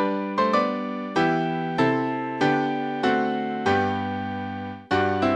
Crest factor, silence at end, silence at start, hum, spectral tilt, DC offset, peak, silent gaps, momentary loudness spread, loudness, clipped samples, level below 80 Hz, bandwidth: 16 dB; 0 s; 0 s; none; -6.5 dB/octave; under 0.1%; -8 dBFS; none; 7 LU; -24 LUFS; under 0.1%; -62 dBFS; 9.4 kHz